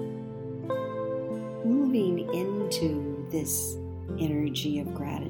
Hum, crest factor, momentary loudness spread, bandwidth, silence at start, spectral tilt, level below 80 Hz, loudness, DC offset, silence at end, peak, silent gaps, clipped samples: none; 14 dB; 11 LU; 19 kHz; 0 s; -5.5 dB/octave; -54 dBFS; -30 LUFS; under 0.1%; 0 s; -16 dBFS; none; under 0.1%